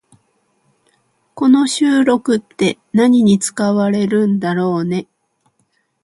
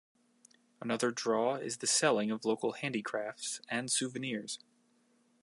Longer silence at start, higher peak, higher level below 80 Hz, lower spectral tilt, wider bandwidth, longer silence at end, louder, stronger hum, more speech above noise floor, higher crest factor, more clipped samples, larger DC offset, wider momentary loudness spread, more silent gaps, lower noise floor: first, 1.35 s vs 0.8 s; first, 0 dBFS vs -14 dBFS; first, -60 dBFS vs -86 dBFS; first, -5.5 dB/octave vs -2.5 dB/octave; about the same, 11.5 kHz vs 11.5 kHz; first, 1 s vs 0.85 s; first, -15 LUFS vs -33 LUFS; neither; first, 50 dB vs 37 dB; second, 16 dB vs 22 dB; neither; neither; second, 7 LU vs 11 LU; neither; second, -64 dBFS vs -71 dBFS